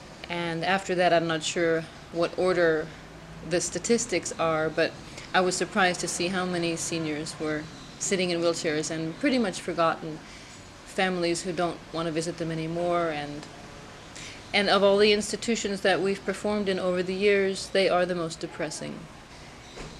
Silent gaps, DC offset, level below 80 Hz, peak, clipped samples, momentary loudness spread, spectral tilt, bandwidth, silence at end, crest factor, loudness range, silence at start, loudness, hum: none; under 0.1%; -56 dBFS; -8 dBFS; under 0.1%; 18 LU; -4 dB/octave; 13.5 kHz; 0 s; 20 dB; 5 LU; 0 s; -27 LUFS; none